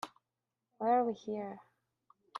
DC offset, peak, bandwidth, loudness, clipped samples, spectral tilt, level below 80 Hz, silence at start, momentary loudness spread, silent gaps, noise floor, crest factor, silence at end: under 0.1%; -18 dBFS; 12.5 kHz; -34 LUFS; under 0.1%; -6 dB/octave; -86 dBFS; 0.05 s; 18 LU; none; -89 dBFS; 18 dB; 0 s